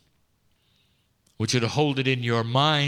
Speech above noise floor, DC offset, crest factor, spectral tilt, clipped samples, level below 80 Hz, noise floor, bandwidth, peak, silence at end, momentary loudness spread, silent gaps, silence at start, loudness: 44 dB; under 0.1%; 18 dB; -5 dB/octave; under 0.1%; -66 dBFS; -67 dBFS; 13 kHz; -8 dBFS; 0 s; 4 LU; none; 1.4 s; -24 LUFS